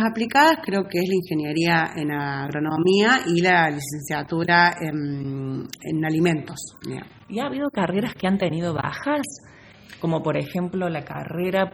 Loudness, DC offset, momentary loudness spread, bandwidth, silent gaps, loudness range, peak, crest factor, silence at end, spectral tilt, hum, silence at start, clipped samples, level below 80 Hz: -22 LUFS; under 0.1%; 14 LU; over 20 kHz; none; 6 LU; -2 dBFS; 20 dB; 0.05 s; -5.5 dB/octave; none; 0 s; under 0.1%; -58 dBFS